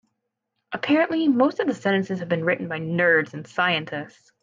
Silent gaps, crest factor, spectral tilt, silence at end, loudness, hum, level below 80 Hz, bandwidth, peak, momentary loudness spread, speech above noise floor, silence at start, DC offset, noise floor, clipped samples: none; 16 dB; -6.5 dB/octave; 0.35 s; -22 LUFS; none; -70 dBFS; 7.6 kHz; -8 dBFS; 12 LU; 56 dB; 0.7 s; under 0.1%; -79 dBFS; under 0.1%